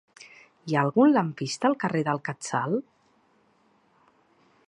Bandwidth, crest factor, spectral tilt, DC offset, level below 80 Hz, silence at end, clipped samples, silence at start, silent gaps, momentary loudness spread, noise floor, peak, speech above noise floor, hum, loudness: 11 kHz; 20 dB; -6 dB/octave; under 0.1%; -76 dBFS; 1.85 s; under 0.1%; 0.2 s; none; 10 LU; -65 dBFS; -8 dBFS; 40 dB; none; -25 LUFS